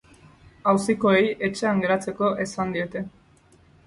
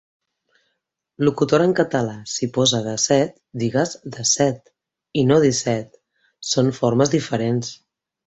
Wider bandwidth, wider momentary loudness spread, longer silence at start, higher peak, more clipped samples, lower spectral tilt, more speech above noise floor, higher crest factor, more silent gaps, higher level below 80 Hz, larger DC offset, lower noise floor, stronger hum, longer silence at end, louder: first, 11.5 kHz vs 8.4 kHz; about the same, 10 LU vs 9 LU; second, 0.65 s vs 1.2 s; second, -6 dBFS vs -2 dBFS; neither; about the same, -5.5 dB/octave vs -4.5 dB/octave; second, 33 dB vs 56 dB; about the same, 18 dB vs 18 dB; neither; about the same, -58 dBFS vs -56 dBFS; neither; second, -56 dBFS vs -75 dBFS; neither; first, 0.75 s vs 0.5 s; second, -23 LUFS vs -20 LUFS